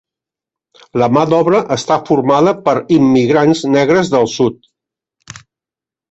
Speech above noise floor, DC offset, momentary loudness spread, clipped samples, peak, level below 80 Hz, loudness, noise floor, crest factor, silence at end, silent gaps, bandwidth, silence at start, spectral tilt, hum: 76 dB; under 0.1%; 5 LU; under 0.1%; 0 dBFS; -52 dBFS; -12 LUFS; -88 dBFS; 12 dB; 1.55 s; none; 8.2 kHz; 0.95 s; -6 dB/octave; none